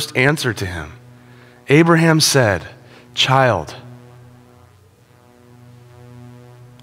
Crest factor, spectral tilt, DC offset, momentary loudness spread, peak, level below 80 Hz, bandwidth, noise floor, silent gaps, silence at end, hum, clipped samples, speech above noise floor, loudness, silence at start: 18 dB; -4.5 dB/octave; under 0.1%; 21 LU; 0 dBFS; -50 dBFS; 16.5 kHz; -50 dBFS; none; 0.55 s; none; under 0.1%; 35 dB; -15 LUFS; 0 s